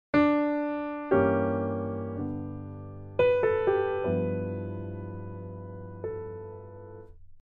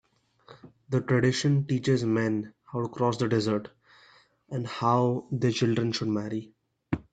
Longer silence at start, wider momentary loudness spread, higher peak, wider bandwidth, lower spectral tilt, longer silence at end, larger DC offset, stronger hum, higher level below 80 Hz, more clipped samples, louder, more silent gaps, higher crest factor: second, 0.15 s vs 0.5 s; first, 18 LU vs 11 LU; about the same, -10 dBFS vs -10 dBFS; second, 5.2 kHz vs 9.2 kHz; first, -9.5 dB/octave vs -6.5 dB/octave; about the same, 0.05 s vs 0.1 s; neither; neither; first, -56 dBFS vs -62 dBFS; neither; about the same, -29 LUFS vs -28 LUFS; neither; about the same, 18 dB vs 18 dB